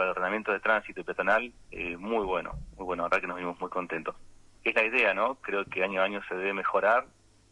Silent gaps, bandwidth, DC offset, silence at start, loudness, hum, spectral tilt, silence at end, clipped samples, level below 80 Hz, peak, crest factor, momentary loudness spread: none; 11 kHz; under 0.1%; 0 s; -29 LUFS; none; -5.5 dB/octave; 0.45 s; under 0.1%; -54 dBFS; -12 dBFS; 18 dB; 11 LU